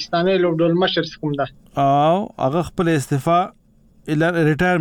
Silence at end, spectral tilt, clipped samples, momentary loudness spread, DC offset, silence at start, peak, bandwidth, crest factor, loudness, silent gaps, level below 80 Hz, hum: 0 s; -6.5 dB/octave; under 0.1%; 8 LU; under 0.1%; 0 s; -8 dBFS; 16.5 kHz; 12 dB; -19 LUFS; none; -48 dBFS; none